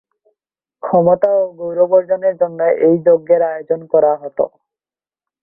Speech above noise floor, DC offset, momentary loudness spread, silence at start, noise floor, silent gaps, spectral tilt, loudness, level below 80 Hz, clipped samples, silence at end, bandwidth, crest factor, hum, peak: over 76 dB; under 0.1%; 9 LU; 0.85 s; under -90 dBFS; none; -12 dB/octave; -15 LUFS; -60 dBFS; under 0.1%; 0.95 s; 2.7 kHz; 14 dB; none; -2 dBFS